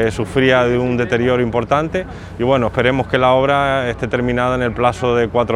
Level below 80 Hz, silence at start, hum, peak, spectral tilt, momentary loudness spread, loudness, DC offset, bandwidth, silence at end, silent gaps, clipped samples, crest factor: -36 dBFS; 0 s; none; 0 dBFS; -6.5 dB/octave; 6 LU; -16 LUFS; under 0.1%; 12 kHz; 0 s; none; under 0.1%; 16 dB